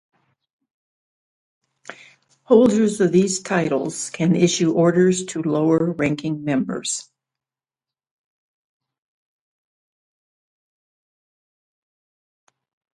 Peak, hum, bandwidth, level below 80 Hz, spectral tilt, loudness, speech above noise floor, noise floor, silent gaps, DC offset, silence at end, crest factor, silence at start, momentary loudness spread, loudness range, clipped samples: -2 dBFS; none; 11.5 kHz; -62 dBFS; -5.5 dB/octave; -19 LUFS; over 72 dB; under -90 dBFS; none; under 0.1%; 5.95 s; 22 dB; 1.9 s; 10 LU; 11 LU; under 0.1%